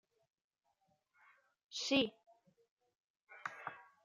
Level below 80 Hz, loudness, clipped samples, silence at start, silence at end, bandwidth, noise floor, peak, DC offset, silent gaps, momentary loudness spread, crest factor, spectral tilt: -82 dBFS; -39 LUFS; under 0.1%; 1.7 s; 0.2 s; 9.6 kHz; -81 dBFS; -22 dBFS; under 0.1%; 2.71-2.77 s, 2.95-3.14 s; 16 LU; 22 dB; -3 dB/octave